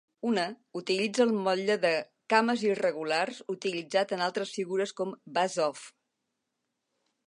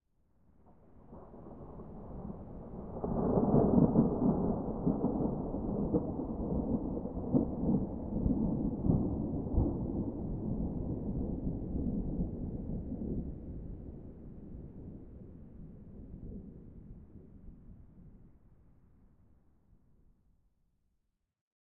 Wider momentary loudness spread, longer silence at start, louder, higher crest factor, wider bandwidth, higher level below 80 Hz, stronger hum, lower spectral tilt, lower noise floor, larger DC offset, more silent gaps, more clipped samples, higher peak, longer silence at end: second, 8 LU vs 22 LU; second, 0.25 s vs 0.65 s; first, -29 LUFS vs -34 LUFS; about the same, 22 dB vs 24 dB; first, 11 kHz vs 1.9 kHz; second, -84 dBFS vs -46 dBFS; neither; second, -4 dB/octave vs -12 dB/octave; about the same, -83 dBFS vs -81 dBFS; second, under 0.1% vs 0.1%; neither; neither; first, -8 dBFS vs -12 dBFS; first, 1.4 s vs 0.25 s